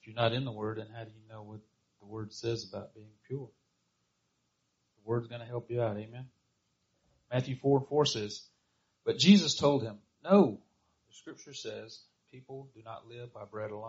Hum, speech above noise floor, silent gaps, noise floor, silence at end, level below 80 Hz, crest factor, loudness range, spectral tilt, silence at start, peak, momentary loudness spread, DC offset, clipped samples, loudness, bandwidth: none; 47 dB; none; -79 dBFS; 0 s; -70 dBFS; 24 dB; 15 LU; -5 dB/octave; 0.05 s; -8 dBFS; 24 LU; under 0.1%; under 0.1%; -30 LUFS; 7.6 kHz